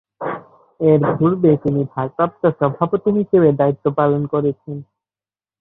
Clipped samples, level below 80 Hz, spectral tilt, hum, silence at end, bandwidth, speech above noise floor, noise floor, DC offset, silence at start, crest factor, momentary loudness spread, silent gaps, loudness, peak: under 0.1%; -56 dBFS; -12 dB/octave; none; 0.75 s; 4 kHz; over 74 dB; under -90 dBFS; under 0.1%; 0.2 s; 16 dB; 13 LU; none; -17 LUFS; -2 dBFS